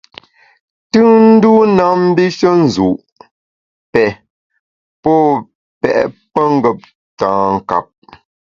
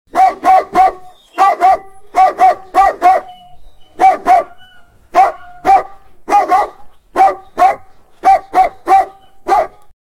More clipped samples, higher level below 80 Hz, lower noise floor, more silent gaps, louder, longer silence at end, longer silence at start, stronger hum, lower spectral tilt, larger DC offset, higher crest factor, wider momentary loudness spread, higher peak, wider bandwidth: neither; second, -50 dBFS vs -44 dBFS; first, under -90 dBFS vs -42 dBFS; first, 3.12-3.16 s, 3.31-3.93 s, 4.30-4.50 s, 4.59-5.03 s, 5.55-5.81 s, 6.95-7.17 s vs none; about the same, -12 LUFS vs -12 LUFS; first, 0.65 s vs 0.35 s; first, 0.95 s vs 0.15 s; neither; first, -7 dB/octave vs -3.5 dB/octave; neither; about the same, 14 dB vs 12 dB; about the same, 12 LU vs 11 LU; about the same, 0 dBFS vs 0 dBFS; second, 7.4 kHz vs 14.5 kHz